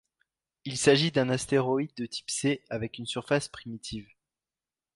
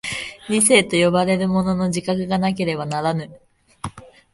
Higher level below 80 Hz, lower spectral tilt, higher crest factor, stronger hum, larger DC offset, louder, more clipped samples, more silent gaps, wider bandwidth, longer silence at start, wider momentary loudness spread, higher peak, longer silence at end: second, -62 dBFS vs -50 dBFS; about the same, -4.5 dB/octave vs -4 dB/octave; about the same, 22 dB vs 20 dB; neither; neither; second, -28 LUFS vs -19 LUFS; neither; neither; about the same, 11.5 kHz vs 11.5 kHz; first, 0.65 s vs 0.05 s; second, 16 LU vs 20 LU; second, -8 dBFS vs 0 dBFS; first, 0.9 s vs 0.3 s